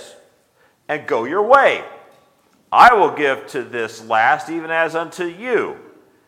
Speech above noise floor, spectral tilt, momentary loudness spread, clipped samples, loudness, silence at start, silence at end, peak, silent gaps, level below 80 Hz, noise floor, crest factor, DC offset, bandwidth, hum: 42 dB; -4 dB/octave; 16 LU; under 0.1%; -16 LUFS; 0 s; 0.5 s; 0 dBFS; none; -56 dBFS; -58 dBFS; 18 dB; under 0.1%; 16 kHz; none